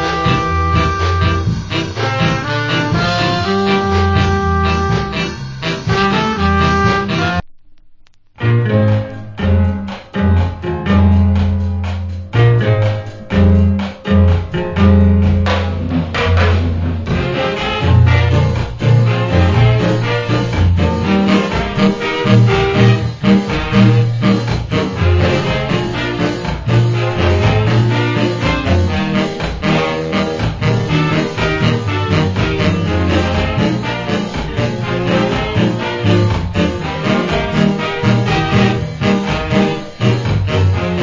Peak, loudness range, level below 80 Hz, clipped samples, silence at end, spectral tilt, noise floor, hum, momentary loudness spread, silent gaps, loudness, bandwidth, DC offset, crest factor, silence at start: 0 dBFS; 3 LU; -24 dBFS; under 0.1%; 0 s; -7 dB/octave; -42 dBFS; none; 7 LU; none; -14 LUFS; 7.6 kHz; under 0.1%; 14 dB; 0 s